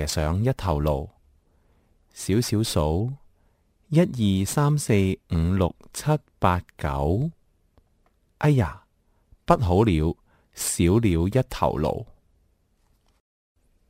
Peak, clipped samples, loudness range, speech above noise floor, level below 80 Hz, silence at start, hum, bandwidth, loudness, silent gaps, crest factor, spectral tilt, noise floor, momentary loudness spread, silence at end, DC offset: -2 dBFS; under 0.1%; 4 LU; 43 dB; -38 dBFS; 0 s; none; 16 kHz; -24 LUFS; none; 22 dB; -6 dB/octave; -65 dBFS; 10 LU; 1.8 s; under 0.1%